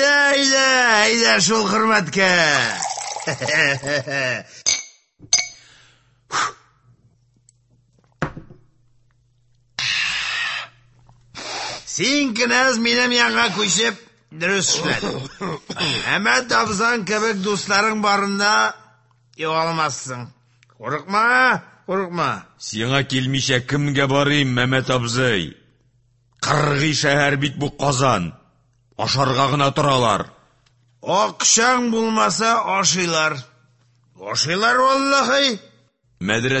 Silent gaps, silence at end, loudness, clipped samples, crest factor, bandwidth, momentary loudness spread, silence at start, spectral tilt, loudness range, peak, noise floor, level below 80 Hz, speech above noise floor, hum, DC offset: none; 0 s; -18 LUFS; under 0.1%; 18 dB; 8.6 kHz; 14 LU; 0 s; -3 dB/octave; 8 LU; -2 dBFS; -60 dBFS; -54 dBFS; 41 dB; none; under 0.1%